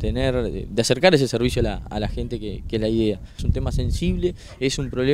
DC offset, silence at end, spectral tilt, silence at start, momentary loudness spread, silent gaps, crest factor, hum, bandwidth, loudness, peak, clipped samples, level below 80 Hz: under 0.1%; 0 s; -5.5 dB/octave; 0 s; 11 LU; none; 22 dB; none; 16 kHz; -23 LUFS; 0 dBFS; under 0.1%; -30 dBFS